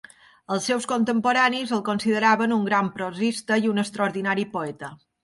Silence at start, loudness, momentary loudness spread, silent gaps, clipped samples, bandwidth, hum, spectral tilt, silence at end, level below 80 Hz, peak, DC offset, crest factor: 0.5 s; -23 LUFS; 10 LU; none; under 0.1%; 11.5 kHz; none; -4.5 dB/octave; 0.3 s; -68 dBFS; -6 dBFS; under 0.1%; 18 dB